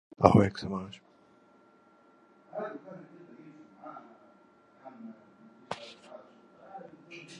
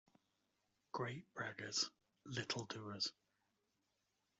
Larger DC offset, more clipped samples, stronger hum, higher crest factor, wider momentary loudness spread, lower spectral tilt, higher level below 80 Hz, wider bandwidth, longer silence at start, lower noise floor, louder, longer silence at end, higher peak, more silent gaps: neither; neither; neither; first, 34 dB vs 24 dB; first, 29 LU vs 8 LU; first, -7.5 dB/octave vs -2.5 dB/octave; first, -58 dBFS vs -84 dBFS; first, 11 kHz vs 8.2 kHz; second, 0.2 s vs 0.95 s; second, -62 dBFS vs -86 dBFS; first, -29 LUFS vs -45 LUFS; second, 0 s vs 1.3 s; first, -2 dBFS vs -26 dBFS; neither